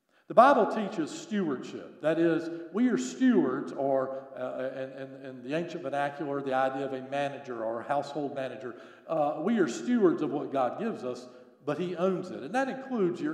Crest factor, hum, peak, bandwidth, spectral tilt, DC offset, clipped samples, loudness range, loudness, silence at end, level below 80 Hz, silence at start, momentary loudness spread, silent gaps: 24 dB; none; -6 dBFS; 11 kHz; -6 dB/octave; under 0.1%; under 0.1%; 5 LU; -30 LUFS; 0 s; -88 dBFS; 0.3 s; 12 LU; none